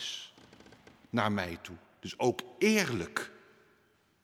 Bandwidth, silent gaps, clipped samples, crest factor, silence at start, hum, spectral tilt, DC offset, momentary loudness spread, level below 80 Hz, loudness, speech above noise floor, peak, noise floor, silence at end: 16 kHz; none; under 0.1%; 22 dB; 0 s; none; -4.5 dB/octave; under 0.1%; 18 LU; -68 dBFS; -32 LUFS; 37 dB; -12 dBFS; -69 dBFS; 0.9 s